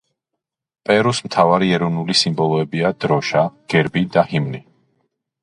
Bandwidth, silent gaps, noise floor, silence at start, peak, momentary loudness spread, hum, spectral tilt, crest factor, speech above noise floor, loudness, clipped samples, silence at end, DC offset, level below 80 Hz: 11.5 kHz; none; -81 dBFS; 0.9 s; 0 dBFS; 5 LU; none; -5.5 dB/octave; 18 dB; 64 dB; -17 LUFS; under 0.1%; 0.85 s; under 0.1%; -54 dBFS